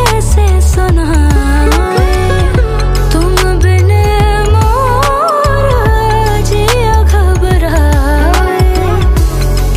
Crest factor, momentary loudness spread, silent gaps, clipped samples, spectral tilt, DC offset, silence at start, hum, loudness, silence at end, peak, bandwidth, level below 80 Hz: 8 dB; 2 LU; none; under 0.1%; -5.5 dB/octave; under 0.1%; 0 s; none; -10 LUFS; 0 s; 0 dBFS; 15.5 kHz; -10 dBFS